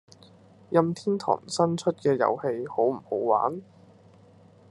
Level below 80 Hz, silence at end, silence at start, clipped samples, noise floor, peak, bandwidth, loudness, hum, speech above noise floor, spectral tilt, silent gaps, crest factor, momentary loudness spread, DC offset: -76 dBFS; 1.1 s; 0.7 s; under 0.1%; -54 dBFS; -4 dBFS; 11.5 kHz; -26 LUFS; none; 29 dB; -6 dB/octave; none; 22 dB; 5 LU; under 0.1%